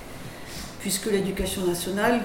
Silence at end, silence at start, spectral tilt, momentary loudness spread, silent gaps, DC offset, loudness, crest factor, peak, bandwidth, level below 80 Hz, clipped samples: 0 s; 0 s; -4 dB/octave; 13 LU; none; under 0.1%; -27 LUFS; 18 dB; -10 dBFS; 18 kHz; -44 dBFS; under 0.1%